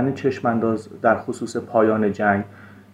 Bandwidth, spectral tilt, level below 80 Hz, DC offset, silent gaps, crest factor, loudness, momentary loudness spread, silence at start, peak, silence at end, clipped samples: 11 kHz; -7 dB/octave; -64 dBFS; under 0.1%; none; 18 dB; -21 LUFS; 7 LU; 0 s; -4 dBFS; 0.2 s; under 0.1%